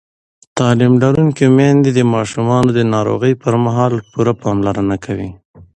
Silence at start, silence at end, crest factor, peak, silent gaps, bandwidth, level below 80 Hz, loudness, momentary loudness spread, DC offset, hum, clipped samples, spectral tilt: 0.55 s; 0.1 s; 14 dB; 0 dBFS; 5.45-5.54 s; 9.4 kHz; -44 dBFS; -14 LUFS; 7 LU; under 0.1%; none; under 0.1%; -7.5 dB/octave